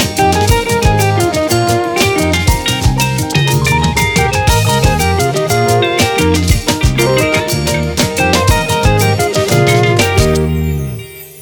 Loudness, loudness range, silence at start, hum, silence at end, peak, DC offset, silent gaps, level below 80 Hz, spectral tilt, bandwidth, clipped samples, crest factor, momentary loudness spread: -12 LUFS; 1 LU; 0 s; none; 0 s; 0 dBFS; under 0.1%; none; -22 dBFS; -4.5 dB/octave; over 20 kHz; under 0.1%; 12 dB; 4 LU